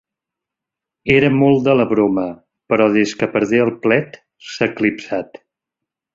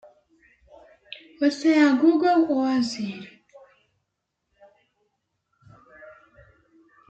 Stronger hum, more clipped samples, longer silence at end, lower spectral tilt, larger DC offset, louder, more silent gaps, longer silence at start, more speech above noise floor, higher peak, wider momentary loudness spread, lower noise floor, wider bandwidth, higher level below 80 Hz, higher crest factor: neither; neither; second, 0.9 s vs 1.05 s; first, -6.5 dB/octave vs -5 dB/octave; neither; first, -16 LUFS vs -21 LUFS; neither; second, 1.05 s vs 1.4 s; first, 69 dB vs 59 dB; first, -2 dBFS vs -8 dBFS; second, 14 LU vs 25 LU; first, -84 dBFS vs -80 dBFS; second, 7.8 kHz vs 8.6 kHz; first, -54 dBFS vs -70 dBFS; about the same, 16 dB vs 18 dB